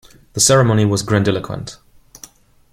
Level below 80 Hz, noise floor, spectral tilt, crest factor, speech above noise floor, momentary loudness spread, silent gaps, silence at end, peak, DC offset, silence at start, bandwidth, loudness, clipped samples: -46 dBFS; -44 dBFS; -4.5 dB/octave; 18 dB; 29 dB; 17 LU; none; 1 s; 0 dBFS; under 0.1%; 0.35 s; 16 kHz; -15 LUFS; under 0.1%